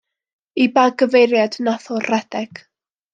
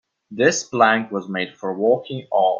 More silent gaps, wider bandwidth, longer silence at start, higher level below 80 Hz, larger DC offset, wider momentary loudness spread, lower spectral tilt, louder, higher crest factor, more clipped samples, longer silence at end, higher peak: neither; first, 9 kHz vs 7.8 kHz; first, 0.55 s vs 0.3 s; about the same, -72 dBFS vs -68 dBFS; neither; first, 14 LU vs 10 LU; about the same, -4.5 dB/octave vs -4 dB/octave; first, -17 LUFS vs -20 LUFS; about the same, 16 dB vs 18 dB; neither; first, 0.65 s vs 0 s; about the same, -2 dBFS vs -2 dBFS